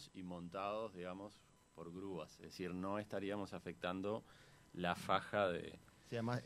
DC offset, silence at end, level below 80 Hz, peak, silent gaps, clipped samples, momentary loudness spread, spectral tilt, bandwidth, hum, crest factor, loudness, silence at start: under 0.1%; 0 s; -74 dBFS; -20 dBFS; none; under 0.1%; 17 LU; -6 dB/octave; 13 kHz; none; 24 dB; -44 LUFS; 0 s